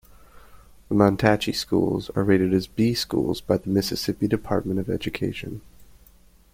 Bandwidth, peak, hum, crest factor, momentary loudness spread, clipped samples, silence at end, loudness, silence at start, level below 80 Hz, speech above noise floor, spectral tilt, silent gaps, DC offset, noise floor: 16.5 kHz; -2 dBFS; none; 22 dB; 8 LU; under 0.1%; 0.7 s; -23 LUFS; 0.35 s; -48 dBFS; 31 dB; -6 dB/octave; none; under 0.1%; -54 dBFS